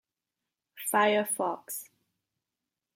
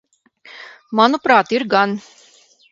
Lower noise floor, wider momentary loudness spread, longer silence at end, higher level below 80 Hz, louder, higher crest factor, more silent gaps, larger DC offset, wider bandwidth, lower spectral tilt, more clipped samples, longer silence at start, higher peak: first, -88 dBFS vs -51 dBFS; second, 14 LU vs 23 LU; first, 1.1 s vs 0.7 s; second, -88 dBFS vs -66 dBFS; second, -29 LUFS vs -16 LUFS; about the same, 20 dB vs 18 dB; neither; neither; first, 16 kHz vs 7.8 kHz; second, -2.5 dB/octave vs -5 dB/octave; neither; first, 0.75 s vs 0.55 s; second, -12 dBFS vs 0 dBFS